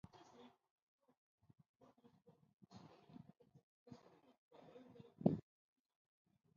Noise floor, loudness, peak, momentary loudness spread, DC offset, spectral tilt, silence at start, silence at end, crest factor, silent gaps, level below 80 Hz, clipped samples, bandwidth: -71 dBFS; -42 LUFS; -18 dBFS; 26 LU; under 0.1%; -9.5 dB/octave; 0.15 s; 1.15 s; 34 dB; 0.71-0.76 s, 0.82-0.99 s, 1.18-1.38 s, 1.69-1.74 s, 3.63-3.86 s, 4.38-4.51 s; -80 dBFS; under 0.1%; 7 kHz